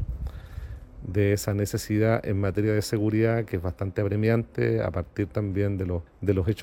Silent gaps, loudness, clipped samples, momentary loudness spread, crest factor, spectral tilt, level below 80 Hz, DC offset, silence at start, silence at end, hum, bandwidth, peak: none; -26 LUFS; under 0.1%; 13 LU; 16 dB; -7 dB/octave; -42 dBFS; under 0.1%; 0 s; 0 s; none; 17 kHz; -10 dBFS